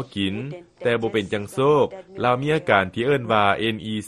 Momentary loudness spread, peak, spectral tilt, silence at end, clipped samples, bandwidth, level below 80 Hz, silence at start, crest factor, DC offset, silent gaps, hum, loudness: 8 LU; -2 dBFS; -6 dB/octave; 0 s; under 0.1%; 12.5 kHz; -56 dBFS; 0 s; 20 dB; under 0.1%; none; none; -22 LUFS